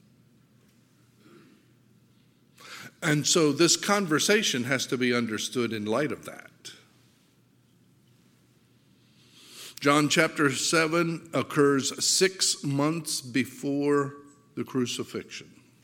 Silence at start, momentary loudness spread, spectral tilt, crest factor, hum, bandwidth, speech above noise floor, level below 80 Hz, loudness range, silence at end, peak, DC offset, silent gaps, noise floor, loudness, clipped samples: 2.6 s; 21 LU; -3.5 dB/octave; 24 dB; none; 17 kHz; 37 dB; -76 dBFS; 10 LU; 0.4 s; -6 dBFS; under 0.1%; none; -63 dBFS; -25 LUFS; under 0.1%